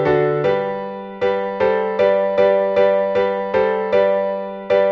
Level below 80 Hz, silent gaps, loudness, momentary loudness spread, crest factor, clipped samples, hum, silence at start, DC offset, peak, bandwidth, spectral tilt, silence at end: -54 dBFS; none; -18 LUFS; 7 LU; 12 dB; under 0.1%; none; 0 s; under 0.1%; -4 dBFS; 6.2 kHz; -7.5 dB/octave; 0 s